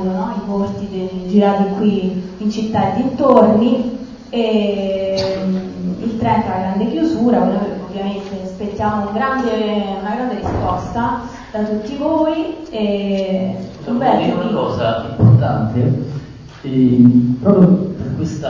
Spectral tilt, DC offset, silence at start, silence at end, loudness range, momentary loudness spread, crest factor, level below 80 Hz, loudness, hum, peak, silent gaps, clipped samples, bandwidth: -8.5 dB/octave; under 0.1%; 0 s; 0 s; 5 LU; 12 LU; 16 dB; -40 dBFS; -17 LUFS; none; 0 dBFS; none; under 0.1%; 7.2 kHz